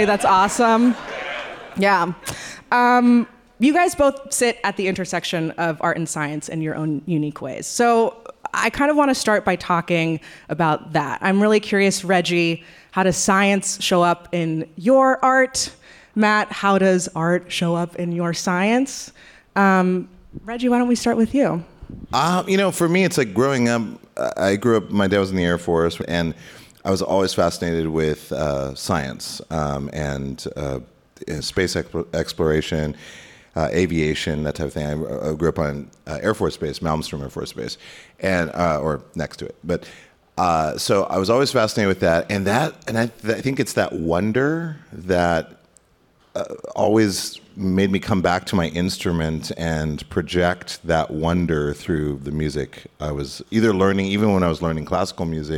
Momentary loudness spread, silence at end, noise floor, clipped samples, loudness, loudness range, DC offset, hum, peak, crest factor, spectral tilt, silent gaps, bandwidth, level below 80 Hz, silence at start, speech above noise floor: 12 LU; 0 s; -58 dBFS; under 0.1%; -20 LUFS; 6 LU; under 0.1%; none; -6 dBFS; 14 dB; -5 dB/octave; none; 17.5 kHz; -46 dBFS; 0 s; 38 dB